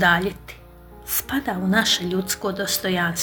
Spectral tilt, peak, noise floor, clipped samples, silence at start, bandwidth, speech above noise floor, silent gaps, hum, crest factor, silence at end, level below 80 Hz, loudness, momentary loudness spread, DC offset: -3 dB/octave; -4 dBFS; -44 dBFS; under 0.1%; 0 s; over 20 kHz; 21 dB; none; none; 20 dB; 0 s; -48 dBFS; -22 LUFS; 15 LU; under 0.1%